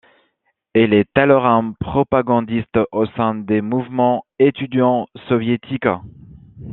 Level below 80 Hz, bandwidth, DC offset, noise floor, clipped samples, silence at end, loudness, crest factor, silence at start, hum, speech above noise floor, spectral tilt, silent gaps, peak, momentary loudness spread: -50 dBFS; 4.1 kHz; under 0.1%; -68 dBFS; under 0.1%; 0 s; -18 LUFS; 16 dB; 0.75 s; none; 51 dB; -10.5 dB/octave; none; 0 dBFS; 7 LU